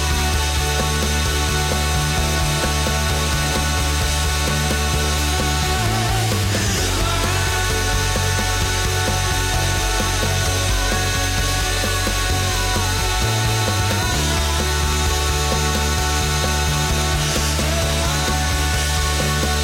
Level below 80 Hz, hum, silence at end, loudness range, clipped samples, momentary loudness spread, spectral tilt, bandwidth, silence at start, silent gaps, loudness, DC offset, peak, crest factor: -24 dBFS; none; 0 s; 0 LU; under 0.1%; 1 LU; -3.5 dB/octave; 17 kHz; 0 s; none; -19 LUFS; under 0.1%; -8 dBFS; 10 dB